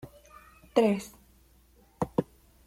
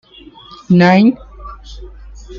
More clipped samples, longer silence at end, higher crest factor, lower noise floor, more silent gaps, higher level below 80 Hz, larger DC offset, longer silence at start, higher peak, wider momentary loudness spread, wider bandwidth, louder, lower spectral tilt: neither; first, 0.45 s vs 0 s; first, 24 dB vs 14 dB; first, -61 dBFS vs -39 dBFS; neither; second, -60 dBFS vs -36 dBFS; neither; second, 0.05 s vs 0.7 s; second, -8 dBFS vs -2 dBFS; about the same, 23 LU vs 25 LU; first, 16.5 kHz vs 7.2 kHz; second, -29 LUFS vs -11 LUFS; second, -6.5 dB/octave vs -8 dB/octave